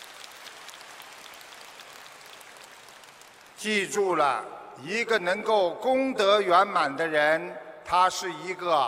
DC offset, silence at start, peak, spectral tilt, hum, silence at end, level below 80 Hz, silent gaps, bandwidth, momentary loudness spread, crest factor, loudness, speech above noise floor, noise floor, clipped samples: under 0.1%; 0 s; -8 dBFS; -3 dB/octave; none; 0 s; -68 dBFS; none; 16 kHz; 22 LU; 20 dB; -25 LUFS; 26 dB; -51 dBFS; under 0.1%